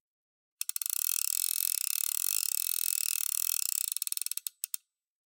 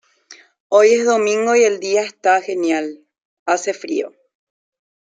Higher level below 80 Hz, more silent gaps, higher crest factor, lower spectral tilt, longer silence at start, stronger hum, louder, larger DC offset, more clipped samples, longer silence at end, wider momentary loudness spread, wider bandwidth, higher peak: second, under -90 dBFS vs -72 dBFS; second, none vs 0.60-0.70 s, 3.25-3.46 s; first, 26 dB vs 16 dB; second, 12 dB/octave vs -2.5 dB/octave; first, 0.6 s vs 0.3 s; neither; second, -29 LUFS vs -17 LUFS; neither; neither; second, 0.5 s vs 1.05 s; second, 8 LU vs 11 LU; first, 17.5 kHz vs 9.4 kHz; second, -8 dBFS vs -2 dBFS